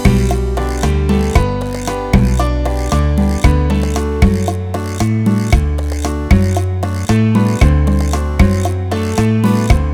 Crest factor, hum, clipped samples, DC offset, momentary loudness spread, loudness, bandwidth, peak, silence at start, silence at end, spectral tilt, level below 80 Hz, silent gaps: 12 dB; none; 0.2%; under 0.1%; 6 LU; -15 LUFS; 15.5 kHz; 0 dBFS; 0 s; 0 s; -7 dB/octave; -18 dBFS; none